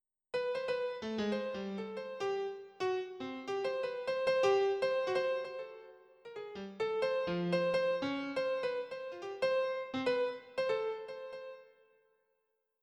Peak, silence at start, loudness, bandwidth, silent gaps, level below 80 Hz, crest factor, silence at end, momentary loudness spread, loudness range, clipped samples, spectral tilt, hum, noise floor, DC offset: -20 dBFS; 0.35 s; -36 LUFS; 9.8 kHz; none; -76 dBFS; 16 dB; 1.2 s; 14 LU; 4 LU; under 0.1%; -5.5 dB/octave; none; -82 dBFS; under 0.1%